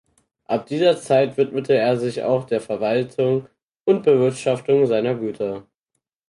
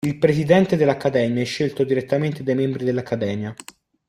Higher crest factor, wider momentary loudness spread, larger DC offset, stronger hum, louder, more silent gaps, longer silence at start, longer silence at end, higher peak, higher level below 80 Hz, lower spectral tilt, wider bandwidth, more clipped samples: about the same, 16 dB vs 18 dB; about the same, 9 LU vs 9 LU; neither; neither; about the same, -20 LUFS vs -20 LUFS; first, 3.62-3.68 s, 3.81-3.86 s vs none; first, 0.5 s vs 0.05 s; first, 0.7 s vs 0.55 s; second, -6 dBFS vs -2 dBFS; second, -64 dBFS vs -56 dBFS; about the same, -6.5 dB/octave vs -7 dB/octave; second, 11.5 kHz vs 14.5 kHz; neither